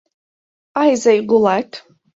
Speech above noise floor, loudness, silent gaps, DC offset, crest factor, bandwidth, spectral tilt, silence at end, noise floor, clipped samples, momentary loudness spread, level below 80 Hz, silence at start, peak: over 76 dB; -15 LUFS; none; under 0.1%; 16 dB; 7.8 kHz; -5 dB/octave; 0.35 s; under -90 dBFS; under 0.1%; 16 LU; -60 dBFS; 0.75 s; -2 dBFS